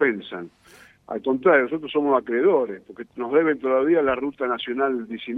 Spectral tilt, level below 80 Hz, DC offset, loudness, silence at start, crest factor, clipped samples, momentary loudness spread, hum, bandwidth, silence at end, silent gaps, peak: -7 dB/octave; -62 dBFS; under 0.1%; -22 LUFS; 0 s; 18 dB; under 0.1%; 16 LU; none; 6 kHz; 0 s; none; -6 dBFS